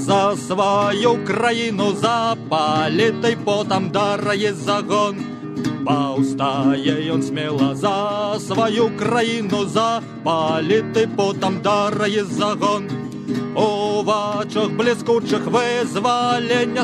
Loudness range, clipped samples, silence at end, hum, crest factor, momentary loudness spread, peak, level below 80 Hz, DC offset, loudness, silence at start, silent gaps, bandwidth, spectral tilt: 2 LU; under 0.1%; 0 s; none; 16 dB; 4 LU; -4 dBFS; -60 dBFS; under 0.1%; -19 LUFS; 0 s; none; 12.5 kHz; -5 dB/octave